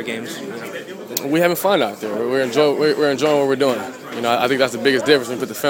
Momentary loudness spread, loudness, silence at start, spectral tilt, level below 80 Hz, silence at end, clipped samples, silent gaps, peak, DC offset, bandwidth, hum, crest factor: 13 LU; -18 LUFS; 0 s; -4 dB/octave; -64 dBFS; 0 s; under 0.1%; none; 0 dBFS; under 0.1%; 19.5 kHz; none; 18 dB